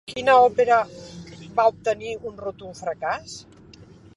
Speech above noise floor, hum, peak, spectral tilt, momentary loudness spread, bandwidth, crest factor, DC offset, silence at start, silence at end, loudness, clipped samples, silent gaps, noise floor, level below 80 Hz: 26 dB; none; -4 dBFS; -4 dB/octave; 23 LU; 11.5 kHz; 18 dB; under 0.1%; 0.1 s; 0.75 s; -22 LUFS; under 0.1%; none; -47 dBFS; -56 dBFS